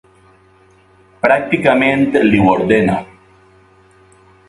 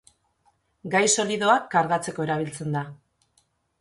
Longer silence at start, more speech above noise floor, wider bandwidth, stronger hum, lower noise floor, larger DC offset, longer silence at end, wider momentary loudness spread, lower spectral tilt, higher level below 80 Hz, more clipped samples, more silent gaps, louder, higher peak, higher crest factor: first, 1.25 s vs 0.85 s; second, 37 dB vs 45 dB; about the same, 11.5 kHz vs 11.5 kHz; neither; second, -49 dBFS vs -68 dBFS; neither; first, 1.45 s vs 0.85 s; second, 6 LU vs 10 LU; first, -7 dB/octave vs -3.5 dB/octave; first, -44 dBFS vs -66 dBFS; neither; neither; first, -13 LUFS vs -23 LUFS; first, 0 dBFS vs -6 dBFS; about the same, 16 dB vs 20 dB